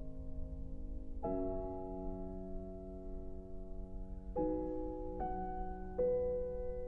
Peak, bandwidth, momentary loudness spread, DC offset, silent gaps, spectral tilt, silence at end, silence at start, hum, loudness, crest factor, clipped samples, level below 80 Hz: -24 dBFS; 2.7 kHz; 13 LU; under 0.1%; none; -11 dB/octave; 0 s; 0 s; none; -43 LUFS; 16 dB; under 0.1%; -46 dBFS